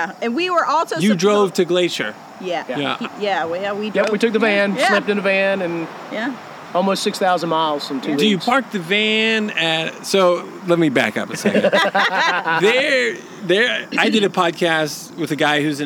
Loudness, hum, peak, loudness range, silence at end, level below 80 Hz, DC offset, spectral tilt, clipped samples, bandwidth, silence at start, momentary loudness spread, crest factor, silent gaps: -18 LUFS; none; 0 dBFS; 3 LU; 0 s; -74 dBFS; under 0.1%; -4 dB/octave; under 0.1%; 18.5 kHz; 0 s; 9 LU; 18 dB; none